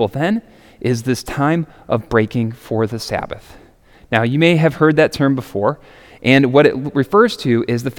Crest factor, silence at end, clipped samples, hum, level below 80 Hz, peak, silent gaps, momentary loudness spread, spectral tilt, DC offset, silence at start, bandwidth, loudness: 16 dB; 0.05 s; under 0.1%; none; -46 dBFS; 0 dBFS; none; 10 LU; -6.5 dB/octave; under 0.1%; 0 s; 18 kHz; -16 LUFS